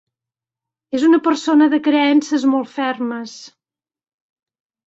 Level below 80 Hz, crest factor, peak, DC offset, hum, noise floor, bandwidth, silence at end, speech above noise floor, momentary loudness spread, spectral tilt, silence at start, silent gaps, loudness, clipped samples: -66 dBFS; 16 dB; -2 dBFS; under 0.1%; none; under -90 dBFS; 8 kHz; 1.4 s; over 74 dB; 11 LU; -3.5 dB/octave; 0.95 s; none; -16 LUFS; under 0.1%